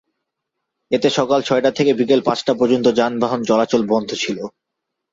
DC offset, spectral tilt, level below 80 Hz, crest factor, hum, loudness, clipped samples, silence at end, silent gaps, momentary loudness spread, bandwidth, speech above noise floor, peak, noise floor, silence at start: under 0.1%; -5 dB/octave; -60 dBFS; 16 dB; none; -17 LUFS; under 0.1%; 0.65 s; none; 7 LU; 7.8 kHz; 62 dB; -2 dBFS; -79 dBFS; 0.9 s